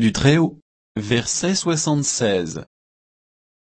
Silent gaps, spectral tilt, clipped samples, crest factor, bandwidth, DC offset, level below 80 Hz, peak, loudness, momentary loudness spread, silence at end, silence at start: 0.62-0.95 s; -4.5 dB/octave; under 0.1%; 18 dB; 8.8 kHz; under 0.1%; -46 dBFS; -2 dBFS; -19 LUFS; 14 LU; 1.1 s; 0 s